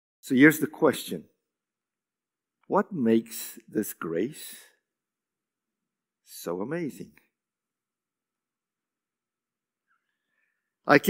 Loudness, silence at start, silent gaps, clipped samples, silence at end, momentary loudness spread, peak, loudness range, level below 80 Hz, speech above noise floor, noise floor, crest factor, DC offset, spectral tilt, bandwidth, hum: -26 LUFS; 0.25 s; none; under 0.1%; 0 s; 21 LU; -2 dBFS; 13 LU; -80 dBFS; over 64 dB; under -90 dBFS; 26 dB; under 0.1%; -5 dB/octave; 16 kHz; none